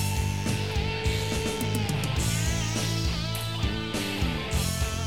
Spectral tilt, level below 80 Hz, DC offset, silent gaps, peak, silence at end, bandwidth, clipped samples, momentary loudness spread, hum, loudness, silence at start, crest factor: -4.5 dB/octave; -36 dBFS; 0.5%; none; -14 dBFS; 0 s; 16.5 kHz; under 0.1%; 3 LU; none; -28 LUFS; 0 s; 12 dB